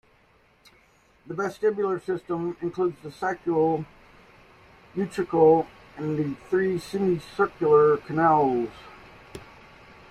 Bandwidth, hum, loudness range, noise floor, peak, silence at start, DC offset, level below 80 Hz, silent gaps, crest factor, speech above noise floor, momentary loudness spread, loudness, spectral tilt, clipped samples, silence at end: 12.5 kHz; none; 6 LU; -61 dBFS; -8 dBFS; 1.25 s; under 0.1%; -60 dBFS; none; 18 dB; 37 dB; 18 LU; -25 LUFS; -7.5 dB/octave; under 0.1%; 0.7 s